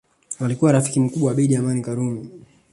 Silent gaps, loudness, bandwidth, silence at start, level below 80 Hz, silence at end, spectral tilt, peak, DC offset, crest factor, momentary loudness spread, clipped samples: none; -20 LUFS; 11.5 kHz; 0.3 s; -58 dBFS; 0.35 s; -7 dB/octave; -4 dBFS; under 0.1%; 18 dB; 14 LU; under 0.1%